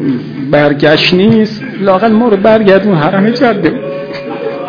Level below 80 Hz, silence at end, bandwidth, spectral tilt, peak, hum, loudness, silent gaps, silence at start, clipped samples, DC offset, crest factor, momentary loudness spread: -44 dBFS; 0 s; 5.4 kHz; -7.5 dB/octave; 0 dBFS; none; -9 LUFS; none; 0 s; 1%; under 0.1%; 10 dB; 12 LU